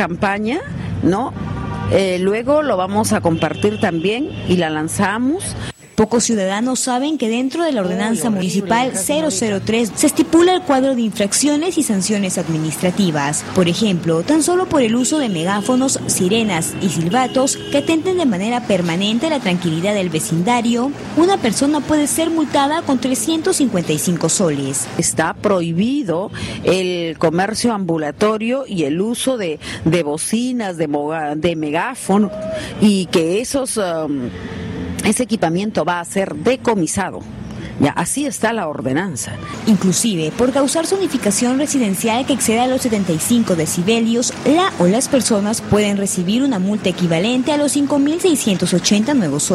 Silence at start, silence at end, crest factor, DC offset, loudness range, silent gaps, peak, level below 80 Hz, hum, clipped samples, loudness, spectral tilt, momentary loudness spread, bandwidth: 0 s; 0 s; 16 dB; under 0.1%; 3 LU; none; -2 dBFS; -46 dBFS; none; under 0.1%; -17 LUFS; -4.5 dB/octave; 5 LU; 14.5 kHz